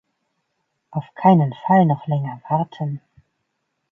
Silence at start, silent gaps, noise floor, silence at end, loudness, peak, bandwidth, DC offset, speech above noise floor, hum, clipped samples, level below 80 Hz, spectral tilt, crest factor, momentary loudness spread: 0.9 s; none; -74 dBFS; 0.95 s; -19 LUFS; -2 dBFS; 3.6 kHz; under 0.1%; 56 dB; none; under 0.1%; -66 dBFS; -10.5 dB/octave; 20 dB; 15 LU